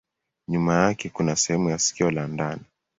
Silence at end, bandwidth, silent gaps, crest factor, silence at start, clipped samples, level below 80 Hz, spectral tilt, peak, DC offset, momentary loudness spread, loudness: 0.4 s; 8 kHz; none; 20 dB; 0.5 s; under 0.1%; -54 dBFS; -4.5 dB/octave; -4 dBFS; under 0.1%; 9 LU; -24 LUFS